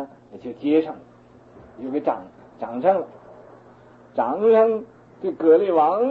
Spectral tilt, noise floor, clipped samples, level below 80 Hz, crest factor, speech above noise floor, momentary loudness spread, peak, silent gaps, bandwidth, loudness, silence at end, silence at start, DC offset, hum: -8.5 dB/octave; -49 dBFS; under 0.1%; -66 dBFS; 16 dB; 29 dB; 20 LU; -6 dBFS; none; 4.4 kHz; -21 LUFS; 0 s; 0 s; under 0.1%; none